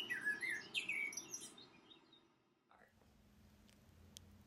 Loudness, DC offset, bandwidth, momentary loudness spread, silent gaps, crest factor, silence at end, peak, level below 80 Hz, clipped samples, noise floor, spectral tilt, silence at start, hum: -43 LUFS; under 0.1%; 16 kHz; 23 LU; none; 22 dB; 0.05 s; -28 dBFS; -80 dBFS; under 0.1%; -76 dBFS; -0.5 dB/octave; 0 s; none